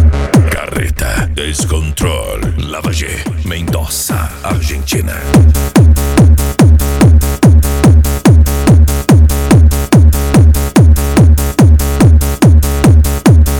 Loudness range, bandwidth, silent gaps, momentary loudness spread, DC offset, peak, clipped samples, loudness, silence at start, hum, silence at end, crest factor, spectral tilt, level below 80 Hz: 8 LU; 18 kHz; none; 8 LU; 0.3%; 0 dBFS; under 0.1%; -10 LUFS; 0 s; none; 0 s; 8 dB; -6 dB/octave; -12 dBFS